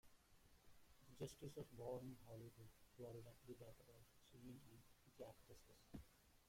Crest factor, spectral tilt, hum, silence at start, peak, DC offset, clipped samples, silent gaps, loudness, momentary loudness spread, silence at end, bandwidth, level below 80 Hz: 20 dB; -6 dB/octave; none; 0.05 s; -40 dBFS; under 0.1%; under 0.1%; none; -60 LUFS; 14 LU; 0 s; 16.5 kHz; -74 dBFS